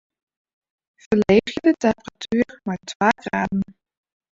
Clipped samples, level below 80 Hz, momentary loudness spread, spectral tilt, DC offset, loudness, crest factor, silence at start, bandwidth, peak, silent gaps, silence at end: under 0.1%; -52 dBFS; 12 LU; -6 dB/octave; under 0.1%; -21 LUFS; 22 dB; 1.1 s; 7.8 kHz; -2 dBFS; 2.95-3.00 s; 0.7 s